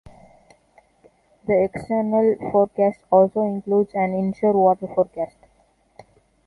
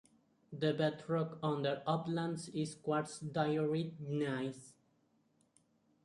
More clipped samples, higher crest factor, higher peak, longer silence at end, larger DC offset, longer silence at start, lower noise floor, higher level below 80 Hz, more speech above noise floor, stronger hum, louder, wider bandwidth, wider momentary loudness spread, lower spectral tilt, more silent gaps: neither; about the same, 18 dB vs 20 dB; first, -4 dBFS vs -20 dBFS; second, 1.2 s vs 1.35 s; neither; first, 1.45 s vs 0.5 s; second, -61 dBFS vs -75 dBFS; first, -58 dBFS vs -78 dBFS; about the same, 41 dB vs 38 dB; neither; first, -20 LUFS vs -38 LUFS; about the same, 11 kHz vs 11.5 kHz; about the same, 7 LU vs 7 LU; first, -10 dB/octave vs -6.5 dB/octave; neither